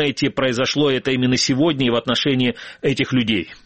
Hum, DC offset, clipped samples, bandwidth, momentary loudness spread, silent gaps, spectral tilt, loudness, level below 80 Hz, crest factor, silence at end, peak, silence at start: none; 0.3%; under 0.1%; 8.6 kHz; 4 LU; none; -4.5 dB/octave; -19 LUFS; -52 dBFS; 16 dB; 0.1 s; -2 dBFS; 0 s